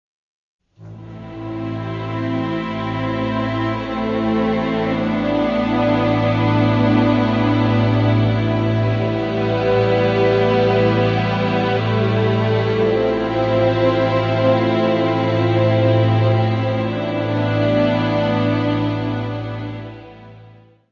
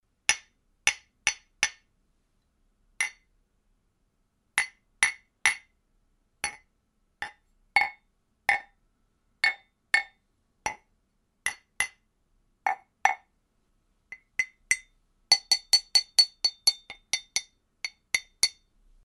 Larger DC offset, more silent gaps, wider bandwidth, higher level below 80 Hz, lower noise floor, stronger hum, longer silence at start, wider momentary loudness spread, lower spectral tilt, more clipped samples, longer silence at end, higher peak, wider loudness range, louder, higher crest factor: neither; neither; second, 6.6 kHz vs 12 kHz; first, -42 dBFS vs -66 dBFS; second, -45 dBFS vs -73 dBFS; neither; first, 0.8 s vs 0.3 s; second, 9 LU vs 17 LU; first, -8.5 dB/octave vs 2.5 dB/octave; neither; second, 0.4 s vs 0.55 s; about the same, -4 dBFS vs -2 dBFS; second, 5 LU vs 9 LU; first, -18 LUFS vs -27 LUFS; second, 14 dB vs 30 dB